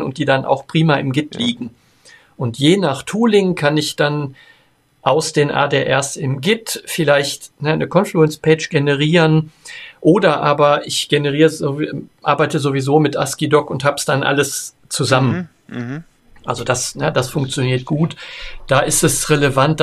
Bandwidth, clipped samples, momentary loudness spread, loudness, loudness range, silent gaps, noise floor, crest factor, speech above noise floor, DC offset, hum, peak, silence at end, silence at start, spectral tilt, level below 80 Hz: 14 kHz; under 0.1%; 11 LU; -16 LUFS; 4 LU; none; -51 dBFS; 16 dB; 35 dB; under 0.1%; none; 0 dBFS; 0 s; 0 s; -4.5 dB/octave; -46 dBFS